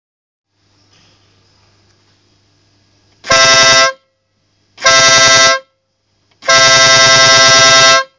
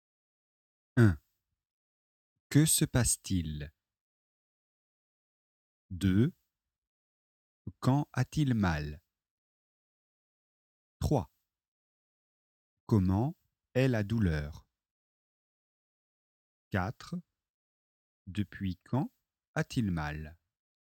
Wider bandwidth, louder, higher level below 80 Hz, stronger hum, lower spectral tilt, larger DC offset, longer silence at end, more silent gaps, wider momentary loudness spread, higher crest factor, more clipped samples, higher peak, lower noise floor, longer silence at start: second, 7.6 kHz vs 17 kHz; first, -5 LUFS vs -31 LUFS; about the same, -48 dBFS vs -52 dBFS; neither; second, 0 dB/octave vs -5.5 dB/octave; neither; second, 0.15 s vs 0.65 s; second, none vs 1.71-2.50 s, 4.01-5.89 s, 6.78-7.65 s, 9.31-11.00 s, 11.68-12.87 s, 14.91-16.71 s, 17.50-18.25 s, 19.47-19.54 s; second, 9 LU vs 16 LU; second, 10 dB vs 22 dB; neither; first, 0 dBFS vs -12 dBFS; second, -62 dBFS vs -84 dBFS; first, 3.25 s vs 0.95 s